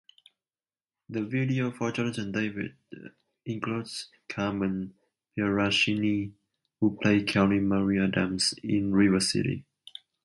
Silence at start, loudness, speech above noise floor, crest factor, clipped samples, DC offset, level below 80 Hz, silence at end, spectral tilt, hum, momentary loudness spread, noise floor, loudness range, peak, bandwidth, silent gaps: 1.1 s; -27 LUFS; over 63 dB; 18 dB; under 0.1%; under 0.1%; -56 dBFS; 0.6 s; -5 dB/octave; none; 16 LU; under -90 dBFS; 7 LU; -10 dBFS; 11.5 kHz; none